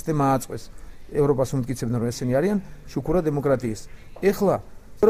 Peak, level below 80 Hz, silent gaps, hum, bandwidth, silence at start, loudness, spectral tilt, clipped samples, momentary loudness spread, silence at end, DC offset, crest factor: -4 dBFS; -42 dBFS; none; none; 16 kHz; 0 s; -24 LUFS; -7 dB/octave; under 0.1%; 10 LU; 0 s; under 0.1%; 18 dB